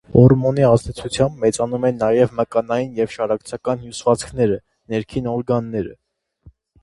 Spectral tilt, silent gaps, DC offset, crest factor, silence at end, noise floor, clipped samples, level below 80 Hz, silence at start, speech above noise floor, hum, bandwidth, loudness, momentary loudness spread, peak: -7 dB/octave; none; under 0.1%; 18 dB; 0.9 s; -50 dBFS; under 0.1%; -44 dBFS; 0.1 s; 32 dB; none; 11.5 kHz; -19 LUFS; 11 LU; 0 dBFS